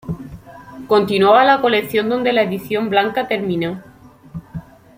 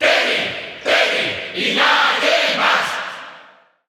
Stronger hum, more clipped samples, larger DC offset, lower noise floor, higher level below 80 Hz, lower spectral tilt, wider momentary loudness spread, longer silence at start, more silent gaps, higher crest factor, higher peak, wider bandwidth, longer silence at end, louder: neither; neither; neither; second, -37 dBFS vs -47 dBFS; first, -50 dBFS vs -62 dBFS; first, -6 dB/octave vs -1.5 dB/octave; first, 23 LU vs 11 LU; about the same, 0.05 s vs 0 s; neither; about the same, 16 dB vs 16 dB; about the same, -2 dBFS vs -2 dBFS; second, 16 kHz vs 19 kHz; about the same, 0.35 s vs 0.45 s; about the same, -16 LUFS vs -16 LUFS